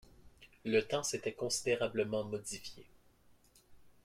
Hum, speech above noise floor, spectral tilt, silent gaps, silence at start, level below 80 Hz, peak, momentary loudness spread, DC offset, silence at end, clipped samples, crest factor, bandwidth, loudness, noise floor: none; 30 dB; -3.5 dB/octave; none; 0.2 s; -68 dBFS; -18 dBFS; 12 LU; under 0.1%; 0.15 s; under 0.1%; 20 dB; 16 kHz; -36 LUFS; -66 dBFS